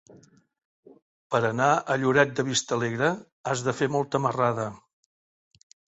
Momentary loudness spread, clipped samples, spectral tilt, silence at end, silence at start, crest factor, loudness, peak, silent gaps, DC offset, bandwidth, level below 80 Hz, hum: 7 LU; under 0.1%; -4.5 dB/octave; 1.2 s; 1.3 s; 24 dB; -25 LUFS; -4 dBFS; 3.32-3.44 s; under 0.1%; 8.2 kHz; -66 dBFS; none